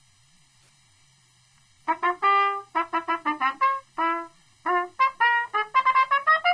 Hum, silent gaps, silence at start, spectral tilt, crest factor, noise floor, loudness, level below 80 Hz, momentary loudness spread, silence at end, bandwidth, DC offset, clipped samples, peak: none; none; 1.9 s; -2.5 dB/octave; 16 dB; -60 dBFS; -23 LUFS; -72 dBFS; 9 LU; 0 s; 10.5 kHz; under 0.1%; under 0.1%; -10 dBFS